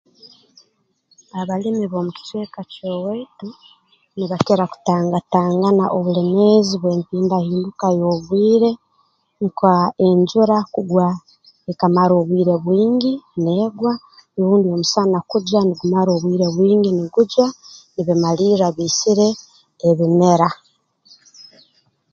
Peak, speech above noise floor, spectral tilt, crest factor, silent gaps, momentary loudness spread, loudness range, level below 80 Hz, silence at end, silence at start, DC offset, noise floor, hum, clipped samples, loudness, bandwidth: 0 dBFS; 47 dB; -6.5 dB/octave; 18 dB; none; 14 LU; 7 LU; -60 dBFS; 0.7 s; 0.25 s; under 0.1%; -63 dBFS; none; under 0.1%; -17 LUFS; 7.6 kHz